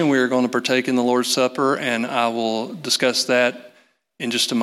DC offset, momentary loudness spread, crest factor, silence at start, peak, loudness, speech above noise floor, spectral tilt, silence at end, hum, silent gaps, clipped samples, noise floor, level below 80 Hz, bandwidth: under 0.1%; 6 LU; 16 dB; 0 s; -4 dBFS; -20 LUFS; 37 dB; -3 dB/octave; 0 s; none; none; under 0.1%; -57 dBFS; -76 dBFS; 15 kHz